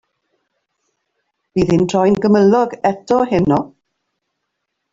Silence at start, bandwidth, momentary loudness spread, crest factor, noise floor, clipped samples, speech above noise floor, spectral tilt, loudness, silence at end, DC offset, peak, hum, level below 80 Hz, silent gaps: 1.55 s; 7.8 kHz; 8 LU; 16 dB; -75 dBFS; under 0.1%; 61 dB; -7.5 dB/octave; -15 LUFS; 1.25 s; under 0.1%; -2 dBFS; none; -46 dBFS; none